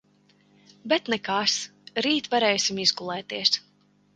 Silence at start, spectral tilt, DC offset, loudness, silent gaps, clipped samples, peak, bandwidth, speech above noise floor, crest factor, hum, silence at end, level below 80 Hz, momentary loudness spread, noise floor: 0.85 s; -2 dB/octave; under 0.1%; -24 LUFS; none; under 0.1%; -6 dBFS; 11 kHz; 38 dB; 20 dB; 50 Hz at -50 dBFS; 0.55 s; -72 dBFS; 10 LU; -63 dBFS